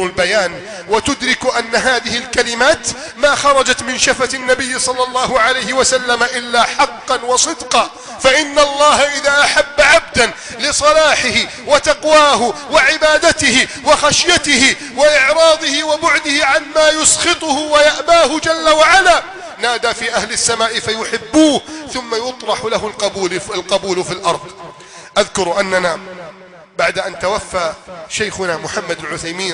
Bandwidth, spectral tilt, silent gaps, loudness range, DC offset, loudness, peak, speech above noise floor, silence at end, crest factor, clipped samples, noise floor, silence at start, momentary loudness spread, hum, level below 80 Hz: 10.5 kHz; -1.5 dB/octave; none; 8 LU; under 0.1%; -13 LUFS; 0 dBFS; 24 dB; 0 s; 14 dB; under 0.1%; -38 dBFS; 0 s; 10 LU; none; -42 dBFS